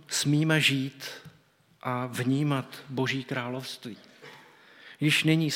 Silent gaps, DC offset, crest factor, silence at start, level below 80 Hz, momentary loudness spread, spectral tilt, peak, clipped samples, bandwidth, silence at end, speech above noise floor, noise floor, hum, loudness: none; under 0.1%; 20 dB; 0.1 s; -76 dBFS; 22 LU; -4.5 dB/octave; -8 dBFS; under 0.1%; 16.5 kHz; 0 s; 35 dB; -62 dBFS; none; -27 LUFS